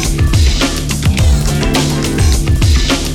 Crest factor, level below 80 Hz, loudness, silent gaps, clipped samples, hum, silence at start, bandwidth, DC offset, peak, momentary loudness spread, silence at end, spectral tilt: 12 dB; -14 dBFS; -13 LUFS; none; under 0.1%; none; 0 s; 16.5 kHz; under 0.1%; 0 dBFS; 3 LU; 0 s; -4.5 dB/octave